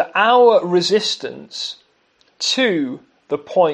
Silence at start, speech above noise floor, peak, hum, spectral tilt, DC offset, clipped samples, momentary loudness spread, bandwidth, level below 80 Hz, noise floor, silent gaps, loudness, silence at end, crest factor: 0 s; 43 dB; 0 dBFS; none; -3.5 dB/octave; under 0.1%; under 0.1%; 15 LU; 10 kHz; -74 dBFS; -59 dBFS; none; -17 LUFS; 0 s; 18 dB